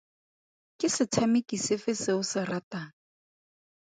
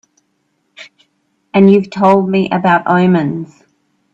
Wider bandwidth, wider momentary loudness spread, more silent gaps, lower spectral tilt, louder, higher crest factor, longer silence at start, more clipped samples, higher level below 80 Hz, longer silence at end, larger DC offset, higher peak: first, 9.6 kHz vs 7.6 kHz; about the same, 13 LU vs 11 LU; first, 2.63-2.71 s vs none; second, -4 dB/octave vs -8.5 dB/octave; second, -29 LUFS vs -12 LUFS; first, 20 dB vs 14 dB; about the same, 0.8 s vs 0.8 s; neither; second, -70 dBFS vs -56 dBFS; first, 1.1 s vs 0.7 s; neither; second, -12 dBFS vs 0 dBFS